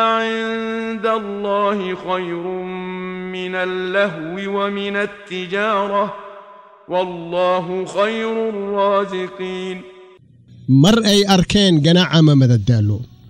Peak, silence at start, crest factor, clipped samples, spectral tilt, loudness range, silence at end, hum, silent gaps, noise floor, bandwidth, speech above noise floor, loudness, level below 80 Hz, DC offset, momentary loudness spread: -2 dBFS; 0 s; 14 dB; under 0.1%; -6 dB/octave; 8 LU; 0 s; none; none; -46 dBFS; 16 kHz; 29 dB; -18 LUFS; -46 dBFS; under 0.1%; 14 LU